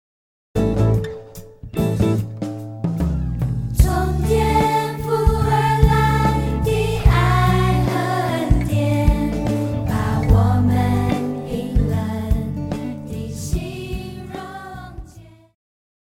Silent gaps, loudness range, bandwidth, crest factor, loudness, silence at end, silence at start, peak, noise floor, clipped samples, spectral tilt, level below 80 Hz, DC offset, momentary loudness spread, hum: none; 8 LU; 16.5 kHz; 18 dB; -20 LUFS; 0.8 s; 0.55 s; 0 dBFS; -44 dBFS; under 0.1%; -7 dB/octave; -26 dBFS; under 0.1%; 14 LU; none